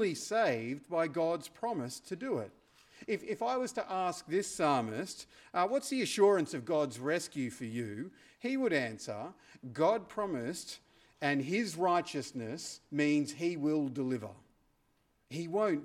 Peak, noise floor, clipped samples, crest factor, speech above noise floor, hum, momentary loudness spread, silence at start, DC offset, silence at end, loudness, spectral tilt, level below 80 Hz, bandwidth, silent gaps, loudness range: -16 dBFS; -74 dBFS; under 0.1%; 18 dB; 40 dB; none; 12 LU; 0 s; under 0.1%; 0 s; -34 LUFS; -5 dB/octave; -76 dBFS; 15.5 kHz; none; 4 LU